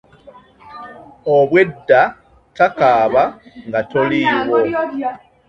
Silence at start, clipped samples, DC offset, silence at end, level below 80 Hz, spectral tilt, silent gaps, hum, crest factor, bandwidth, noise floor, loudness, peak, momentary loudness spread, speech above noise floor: 0.25 s; under 0.1%; under 0.1%; 0.35 s; -54 dBFS; -7 dB/octave; none; none; 16 dB; 7.2 kHz; -44 dBFS; -15 LUFS; 0 dBFS; 20 LU; 29 dB